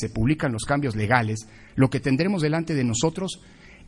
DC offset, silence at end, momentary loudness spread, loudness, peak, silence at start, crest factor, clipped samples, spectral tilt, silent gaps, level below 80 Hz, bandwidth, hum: under 0.1%; 0.15 s; 10 LU; -24 LUFS; -4 dBFS; 0 s; 20 dB; under 0.1%; -5.5 dB/octave; none; -44 dBFS; 11.5 kHz; none